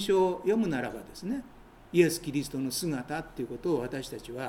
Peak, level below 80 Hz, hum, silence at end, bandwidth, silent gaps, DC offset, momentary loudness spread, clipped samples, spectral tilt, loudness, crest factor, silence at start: -10 dBFS; -56 dBFS; none; 0 s; 17 kHz; none; under 0.1%; 12 LU; under 0.1%; -5 dB/octave; -31 LUFS; 20 dB; 0 s